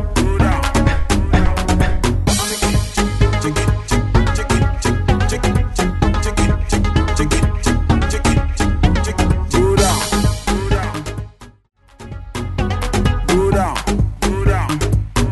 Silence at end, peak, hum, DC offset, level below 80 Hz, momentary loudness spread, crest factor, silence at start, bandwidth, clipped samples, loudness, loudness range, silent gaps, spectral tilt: 0 s; -2 dBFS; none; 0.2%; -20 dBFS; 4 LU; 14 dB; 0 s; 12.5 kHz; under 0.1%; -17 LUFS; 4 LU; none; -5.5 dB/octave